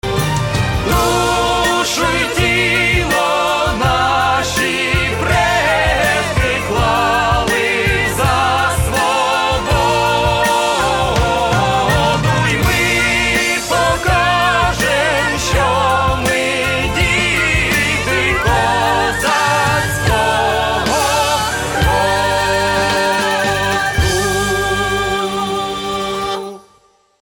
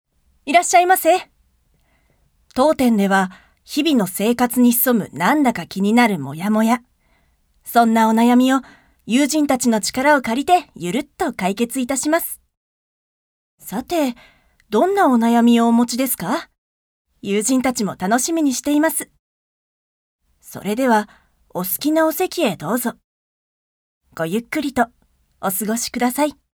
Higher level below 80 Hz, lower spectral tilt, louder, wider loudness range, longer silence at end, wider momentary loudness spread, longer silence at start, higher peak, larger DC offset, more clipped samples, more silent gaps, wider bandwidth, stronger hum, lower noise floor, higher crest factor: first, -28 dBFS vs -56 dBFS; about the same, -3.5 dB/octave vs -4 dB/octave; first, -14 LUFS vs -18 LUFS; second, 1 LU vs 6 LU; first, 0.7 s vs 0.25 s; second, 3 LU vs 11 LU; second, 0.05 s vs 0.45 s; second, -4 dBFS vs 0 dBFS; neither; neither; second, none vs 12.57-13.58 s, 16.58-17.05 s, 19.19-20.19 s, 23.04-24.01 s; about the same, 19 kHz vs over 20 kHz; neither; second, -53 dBFS vs -61 dBFS; second, 12 dB vs 18 dB